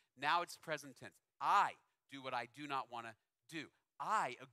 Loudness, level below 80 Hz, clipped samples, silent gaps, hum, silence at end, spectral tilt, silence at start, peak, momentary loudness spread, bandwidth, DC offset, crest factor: -40 LUFS; under -90 dBFS; under 0.1%; none; none; 0.05 s; -3 dB/octave; 0.2 s; -22 dBFS; 21 LU; 15 kHz; under 0.1%; 20 dB